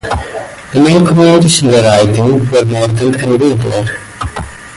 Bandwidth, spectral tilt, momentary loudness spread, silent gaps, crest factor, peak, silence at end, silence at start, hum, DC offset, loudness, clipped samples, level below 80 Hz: 11.5 kHz; -5.5 dB/octave; 15 LU; none; 10 dB; 0 dBFS; 0 s; 0.05 s; none; under 0.1%; -9 LUFS; under 0.1%; -32 dBFS